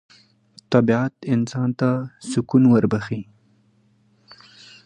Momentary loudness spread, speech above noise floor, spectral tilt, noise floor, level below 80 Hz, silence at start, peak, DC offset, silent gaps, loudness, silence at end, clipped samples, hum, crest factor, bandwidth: 11 LU; 41 dB; -7.5 dB/octave; -60 dBFS; -58 dBFS; 0.7 s; -2 dBFS; under 0.1%; none; -20 LUFS; 1.65 s; under 0.1%; none; 20 dB; 10 kHz